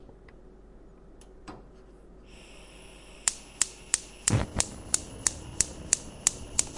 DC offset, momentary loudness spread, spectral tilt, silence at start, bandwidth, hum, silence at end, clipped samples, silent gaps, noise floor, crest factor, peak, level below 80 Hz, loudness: under 0.1%; 23 LU; -2 dB/octave; 0 s; 11.5 kHz; none; 0 s; under 0.1%; none; -51 dBFS; 30 dB; -2 dBFS; -48 dBFS; -28 LUFS